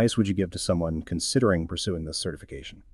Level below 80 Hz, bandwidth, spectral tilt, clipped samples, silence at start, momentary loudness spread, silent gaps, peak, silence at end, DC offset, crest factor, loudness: -44 dBFS; 13 kHz; -5 dB/octave; under 0.1%; 0 s; 13 LU; none; -10 dBFS; 0.15 s; under 0.1%; 16 dB; -27 LUFS